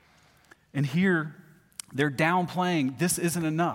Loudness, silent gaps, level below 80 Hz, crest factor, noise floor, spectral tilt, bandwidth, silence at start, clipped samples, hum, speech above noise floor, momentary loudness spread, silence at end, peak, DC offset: -27 LUFS; none; -66 dBFS; 18 dB; -60 dBFS; -5 dB/octave; 16.5 kHz; 0.75 s; under 0.1%; none; 34 dB; 13 LU; 0 s; -10 dBFS; under 0.1%